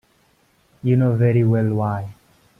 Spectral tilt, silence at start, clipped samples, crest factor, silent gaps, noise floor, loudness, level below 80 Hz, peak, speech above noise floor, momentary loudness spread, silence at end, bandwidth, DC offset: -10.5 dB/octave; 0.85 s; under 0.1%; 14 dB; none; -60 dBFS; -19 LUFS; -54 dBFS; -8 dBFS; 42 dB; 12 LU; 0.45 s; 3.4 kHz; under 0.1%